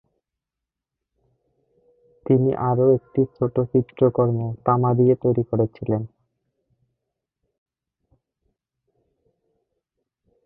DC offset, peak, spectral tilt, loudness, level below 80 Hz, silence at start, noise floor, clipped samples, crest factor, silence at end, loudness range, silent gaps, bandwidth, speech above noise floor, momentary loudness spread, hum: under 0.1%; -4 dBFS; -14 dB/octave; -21 LUFS; -56 dBFS; 2.3 s; -86 dBFS; under 0.1%; 20 dB; 4.4 s; 9 LU; none; 3.5 kHz; 66 dB; 8 LU; none